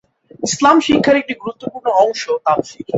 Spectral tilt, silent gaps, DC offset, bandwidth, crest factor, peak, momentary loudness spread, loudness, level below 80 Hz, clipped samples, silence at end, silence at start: -4 dB/octave; none; under 0.1%; 8.2 kHz; 14 dB; 0 dBFS; 13 LU; -15 LUFS; -52 dBFS; under 0.1%; 0 s; 0.4 s